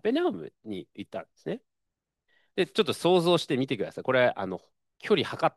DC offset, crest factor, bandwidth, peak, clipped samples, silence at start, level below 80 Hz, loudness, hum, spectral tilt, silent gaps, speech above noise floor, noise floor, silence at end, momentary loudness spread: under 0.1%; 18 dB; 12.5 kHz; -10 dBFS; under 0.1%; 0.05 s; -74 dBFS; -27 LUFS; none; -5.5 dB/octave; none; 57 dB; -84 dBFS; 0.05 s; 16 LU